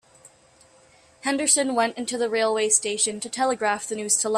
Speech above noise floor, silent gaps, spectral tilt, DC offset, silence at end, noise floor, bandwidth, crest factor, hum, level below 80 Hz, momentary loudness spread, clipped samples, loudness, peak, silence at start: 32 dB; none; -1 dB/octave; under 0.1%; 0 s; -56 dBFS; 15.5 kHz; 20 dB; none; -70 dBFS; 8 LU; under 0.1%; -23 LUFS; -4 dBFS; 1.25 s